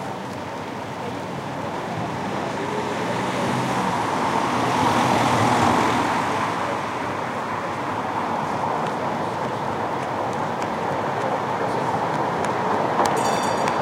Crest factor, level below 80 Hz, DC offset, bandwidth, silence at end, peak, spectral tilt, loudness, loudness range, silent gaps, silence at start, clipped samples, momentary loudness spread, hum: 20 dB; -56 dBFS; under 0.1%; 16 kHz; 0 s; -2 dBFS; -5 dB/octave; -23 LUFS; 5 LU; none; 0 s; under 0.1%; 10 LU; none